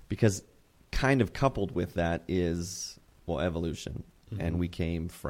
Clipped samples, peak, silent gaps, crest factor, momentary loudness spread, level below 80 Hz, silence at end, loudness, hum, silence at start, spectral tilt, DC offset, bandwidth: under 0.1%; -10 dBFS; none; 22 dB; 13 LU; -46 dBFS; 0 s; -31 LUFS; none; 0 s; -6 dB/octave; under 0.1%; 16.5 kHz